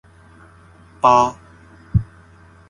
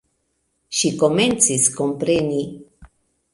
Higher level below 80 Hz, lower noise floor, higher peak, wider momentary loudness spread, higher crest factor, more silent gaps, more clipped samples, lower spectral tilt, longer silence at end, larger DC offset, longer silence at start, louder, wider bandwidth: first, -38 dBFS vs -54 dBFS; second, -47 dBFS vs -70 dBFS; about the same, 0 dBFS vs 0 dBFS; about the same, 9 LU vs 10 LU; about the same, 22 dB vs 22 dB; neither; neither; first, -6.5 dB/octave vs -3 dB/octave; first, 0.65 s vs 0.5 s; neither; first, 1.05 s vs 0.7 s; about the same, -18 LUFS vs -18 LUFS; about the same, 11.5 kHz vs 11.5 kHz